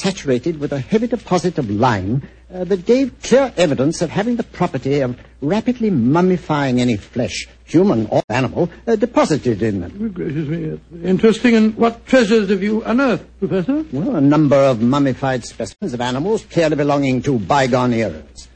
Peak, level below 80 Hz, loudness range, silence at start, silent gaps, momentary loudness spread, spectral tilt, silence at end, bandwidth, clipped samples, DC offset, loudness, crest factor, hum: -2 dBFS; -44 dBFS; 2 LU; 0 s; 8.24-8.28 s; 10 LU; -6.5 dB/octave; 0.1 s; 9.2 kHz; under 0.1%; under 0.1%; -17 LUFS; 16 dB; none